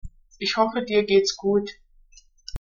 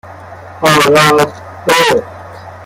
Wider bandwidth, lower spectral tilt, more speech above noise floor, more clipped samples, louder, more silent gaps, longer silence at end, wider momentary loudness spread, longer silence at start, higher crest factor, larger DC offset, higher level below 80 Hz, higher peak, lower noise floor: second, 7.4 kHz vs 17 kHz; about the same, -3 dB/octave vs -3.5 dB/octave; first, 32 dB vs 22 dB; neither; second, -22 LUFS vs -10 LUFS; neither; about the same, 0.05 s vs 0 s; second, 18 LU vs 23 LU; about the same, 0.05 s vs 0.05 s; first, 18 dB vs 12 dB; neither; about the same, -44 dBFS vs -48 dBFS; second, -6 dBFS vs 0 dBFS; first, -54 dBFS vs -31 dBFS